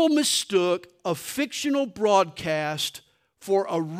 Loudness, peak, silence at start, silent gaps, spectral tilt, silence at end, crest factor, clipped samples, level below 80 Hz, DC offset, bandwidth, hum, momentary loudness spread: -25 LUFS; -6 dBFS; 0 s; none; -3.5 dB/octave; 0 s; 18 dB; under 0.1%; -68 dBFS; under 0.1%; 16 kHz; none; 8 LU